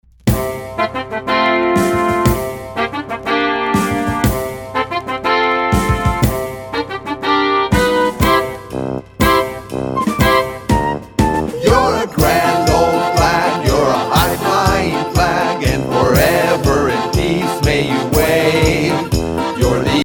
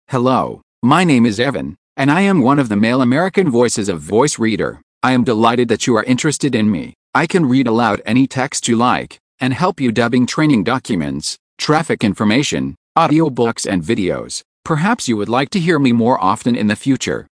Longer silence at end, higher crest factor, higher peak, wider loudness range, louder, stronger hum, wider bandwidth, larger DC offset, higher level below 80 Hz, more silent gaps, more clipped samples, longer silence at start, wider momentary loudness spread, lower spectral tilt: second, 0 s vs 0.15 s; about the same, 14 dB vs 16 dB; about the same, 0 dBFS vs 0 dBFS; about the same, 3 LU vs 2 LU; about the same, -15 LUFS vs -15 LUFS; neither; first, over 20 kHz vs 10.5 kHz; neither; first, -28 dBFS vs -50 dBFS; second, none vs 0.63-0.82 s, 1.78-1.96 s, 4.83-5.01 s, 6.95-7.13 s, 9.20-9.38 s, 11.39-11.57 s, 12.77-12.95 s, 14.45-14.63 s; neither; first, 0.25 s vs 0.1 s; about the same, 8 LU vs 8 LU; about the same, -5 dB/octave vs -5 dB/octave